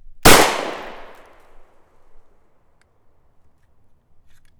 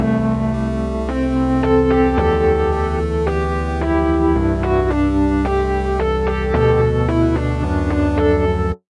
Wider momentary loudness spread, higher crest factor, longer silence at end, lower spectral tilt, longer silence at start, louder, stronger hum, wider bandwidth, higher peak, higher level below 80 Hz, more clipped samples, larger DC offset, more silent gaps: first, 27 LU vs 5 LU; first, 20 dB vs 12 dB; first, 3.65 s vs 0.15 s; second, -2.5 dB/octave vs -8.5 dB/octave; first, 0.15 s vs 0 s; first, -14 LUFS vs -17 LUFS; neither; first, over 20 kHz vs 10.5 kHz; first, 0 dBFS vs -4 dBFS; second, -34 dBFS vs -24 dBFS; neither; neither; neither